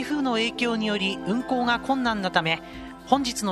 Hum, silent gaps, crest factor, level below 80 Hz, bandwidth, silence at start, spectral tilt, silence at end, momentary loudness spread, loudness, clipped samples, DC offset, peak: none; none; 22 dB; -52 dBFS; 13 kHz; 0 s; -4 dB/octave; 0 s; 4 LU; -25 LUFS; under 0.1%; under 0.1%; -4 dBFS